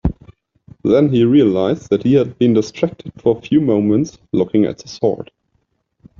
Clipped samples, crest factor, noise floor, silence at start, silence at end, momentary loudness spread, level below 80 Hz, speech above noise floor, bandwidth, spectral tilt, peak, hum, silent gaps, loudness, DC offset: under 0.1%; 14 dB; -66 dBFS; 0.05 s; 0.95 s; 10 LU; -38 dBFS; 51 dB; 7.2 kHz; -8 dB/octave; -2 dBFS; none; none; -16 LUFS; under 0.1%